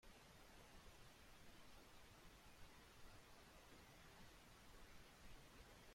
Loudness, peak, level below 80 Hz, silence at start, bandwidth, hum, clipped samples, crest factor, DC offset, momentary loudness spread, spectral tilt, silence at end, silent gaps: -66 LUFS; -50 dBFS; -70 dBFS; 0 s; 16.5 kHz; none; under 0.1%; 14 dB; under 0.1%; 1 LU; -3.5 dB/octave; 0 s; none